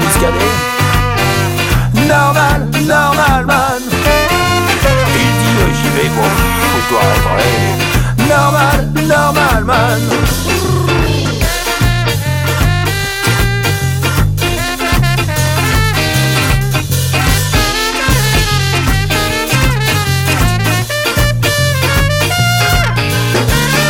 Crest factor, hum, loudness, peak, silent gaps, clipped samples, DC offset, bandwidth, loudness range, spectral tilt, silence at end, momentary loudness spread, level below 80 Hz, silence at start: 12 dB; none; -12 LUFS; 0 dBFS; none; under 0.1%; under 0.1%; 17.5 kHz; 2 LU; -4.5 dB/octave; 0 s; 3 LU; -22 dBFS; 0 s